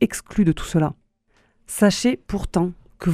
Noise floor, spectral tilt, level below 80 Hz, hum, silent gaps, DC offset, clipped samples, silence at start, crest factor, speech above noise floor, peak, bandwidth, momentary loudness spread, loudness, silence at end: -62 dBFS; -5.5 dB/octave; -40 dBFS; none; none; under 0.1%; under 0.1%; 0 s; 20 dB; 42 dB; -2 dBFS; 15.5 kHz; 9 LU; -22 LUFS; 0 s